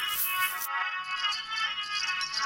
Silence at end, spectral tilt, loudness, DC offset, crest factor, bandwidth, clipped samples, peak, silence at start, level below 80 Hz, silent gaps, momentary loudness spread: 0 s; 2.5 dB/octave; -29 LUFS; under 0.1%; 16 dB; 16 kHz; under 0.1%; -14 dBFS; 0 s; -68 dBFS; none; 3 LU